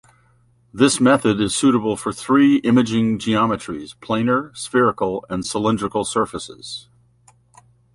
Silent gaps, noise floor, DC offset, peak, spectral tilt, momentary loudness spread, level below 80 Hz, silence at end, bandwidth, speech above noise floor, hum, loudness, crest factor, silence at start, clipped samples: none; -57 dBFS; under 0.1%; -2 dBFS; -5 dB/octave; 16 LU; -52 dBFS; 1.15 s; 11.5 kHz; 39 dB; none; -18 LUFS; 18 dB; 0.75 s; under 0.1%